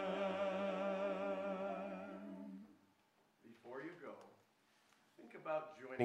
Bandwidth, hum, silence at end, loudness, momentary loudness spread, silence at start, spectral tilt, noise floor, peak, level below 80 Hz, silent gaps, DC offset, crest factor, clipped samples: 9.8 kHz; none; 0 s; -44 LUFS; 19 LU; 0 s; -6.5 dB/octave; -76 dBFS; -22 dBFS; under -90 dBFS; none; under 0.1%; 24 dB; under 0.1%